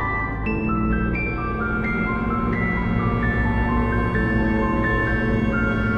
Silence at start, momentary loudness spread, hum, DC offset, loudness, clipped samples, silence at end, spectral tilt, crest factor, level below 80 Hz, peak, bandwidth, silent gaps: 0 s; 3 LU; none; under 0.1%; -22 LUFS; under 0.1%; 0 s; -9 dB/octave; 12 dB; -28 dBFS; -8 dBFS; 7 kHz; none